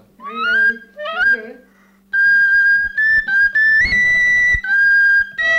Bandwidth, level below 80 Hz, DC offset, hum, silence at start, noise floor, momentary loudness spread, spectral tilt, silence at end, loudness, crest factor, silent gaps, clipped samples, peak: 8.6 kHz; -40 dBFS; under 0.1%; none; 0.2 s; -51 dBFS; 10 LU; -2.5 dB/octave; 0 s; -13 LUFS; 8 dB; none; under 0.1%; -6 dBFS